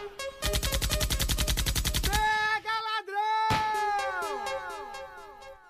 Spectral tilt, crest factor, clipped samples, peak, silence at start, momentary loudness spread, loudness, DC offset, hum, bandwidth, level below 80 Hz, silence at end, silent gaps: -2.5 dB/octave; 16 dB; under 0.1%; -14 dBFS; 0 s; 13 LU; -29 LUFS; under 0.1%; none; 15.5 kHz; -36 dBFS; 0.1 s; none